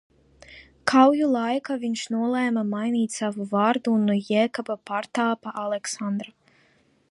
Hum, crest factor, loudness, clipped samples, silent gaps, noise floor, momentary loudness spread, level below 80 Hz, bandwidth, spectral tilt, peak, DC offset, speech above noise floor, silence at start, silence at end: none; 20 dB; -24 LUFS; under 0.1%; none; -62 dBFS; 11 LU; -68 dBFS; 11.5 kHz; -5 dB/octave; -4 dBFS; under 0.1%; 39 dB; 0.5 s; 0.85 s